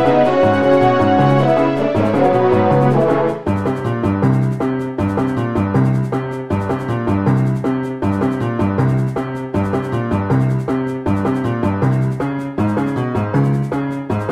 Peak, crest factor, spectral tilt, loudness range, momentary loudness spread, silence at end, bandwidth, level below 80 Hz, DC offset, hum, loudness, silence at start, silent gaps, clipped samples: -2 dBFS; 14 dB; -8.5 dB/octave; 4 LU; 7 LU; 0 s; 10.5 kHz; -42 dBFS; under 0.1%; none; -17 LUFS; 0 s; none; under 0.1%